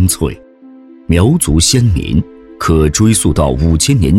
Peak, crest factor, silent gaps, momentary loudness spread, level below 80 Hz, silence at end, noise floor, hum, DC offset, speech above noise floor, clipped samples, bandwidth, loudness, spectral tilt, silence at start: 0 dBFS; 10 dB; none; 10 LU; -22 dBFS; 0 s; -37 dBFS; none; under 0.1%; 27 dB; under 0.1%; 16.5 kHz; -12 LUFS; -5 dB/octave; 0 s